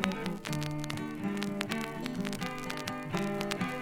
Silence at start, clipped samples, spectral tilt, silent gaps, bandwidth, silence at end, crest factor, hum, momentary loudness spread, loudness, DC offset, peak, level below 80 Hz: 0 s; under 0.1%; -5 dB/octave; none; 17.5 kHz; 0 s; 28 dB; none; 3 LU; -35 LUFS; under 0.1%; -8 dBFS; -56 dBFS